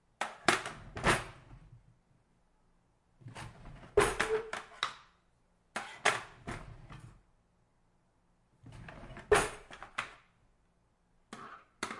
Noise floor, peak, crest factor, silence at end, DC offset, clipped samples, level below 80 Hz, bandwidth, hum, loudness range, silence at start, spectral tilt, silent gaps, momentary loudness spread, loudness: -72 dBFS; -8 dBFS; 30 dB; 0 s; under 0.1%; under 0.1%; -56 dBFS; 11.5 kHz; none; 5 LU; 0.2 s; -3 dB/octave; none; 23 LU; -34 LUFS